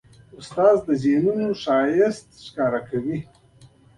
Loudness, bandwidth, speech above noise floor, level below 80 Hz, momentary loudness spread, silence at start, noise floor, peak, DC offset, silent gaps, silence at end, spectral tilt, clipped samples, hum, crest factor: -21 LUFS; 11 kHz; 31 dB; -58 dBFS; 14 LU; 0.4 s; -52 dBFS; -4 dBFS; under 0.1%; none; 0.75 s; -7 dB/octave; under 0.1%; none; 18 dB